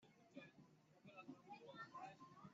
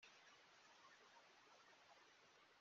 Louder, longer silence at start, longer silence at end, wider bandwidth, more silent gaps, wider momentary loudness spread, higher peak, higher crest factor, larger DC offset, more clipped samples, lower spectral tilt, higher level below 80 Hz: first, -61 LUFS vs -68 LUFS; about the same, 0 s vs 0 s; about the same, 0 s vs 0 s; about the same, 7.4 kHz vs 7.2 kHz; neither; first, 8 LU vs 2 LU; first, -44 dBFS vs -54 dBFS; about the same, 16 dB vs 16 dB; neither; neither; first, -4 dB/octave vs 0.5 dB/octave; about the same, under -90 dBFS vs under -90 dBFS